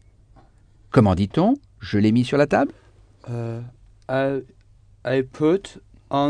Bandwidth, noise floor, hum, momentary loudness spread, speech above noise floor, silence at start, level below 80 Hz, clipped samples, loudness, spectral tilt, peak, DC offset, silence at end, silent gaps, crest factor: 10 kHz; -52 dBFS; none; 14 LU; 32 dB; 0.95 s; -50 dBFS; under 0.1%; -22 LUFS; -8 dB/octave; -2 dBFS; under 0.1%; 0 s; none; 20 dB